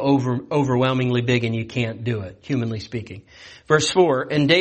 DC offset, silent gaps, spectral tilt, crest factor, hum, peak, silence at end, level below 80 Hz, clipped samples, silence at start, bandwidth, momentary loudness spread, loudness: under 0.1%; none; -5.5 dB/octave; 16 dB; none; -4 dBFS; 0 s; -54 dBFS; under 0.1%; 0 s; 8.8 kHz; 12 LU; -21 LUFS